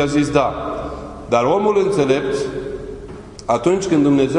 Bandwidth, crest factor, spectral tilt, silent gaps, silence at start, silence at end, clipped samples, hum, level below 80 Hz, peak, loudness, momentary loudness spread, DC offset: 11 kHz; 16 dB; -6 dB/octave; none; 0 s; 0 s; under 0.1%; none; -40 dBFS; -2 dBFS; -18 LUFS; 15 LU; under 0.1%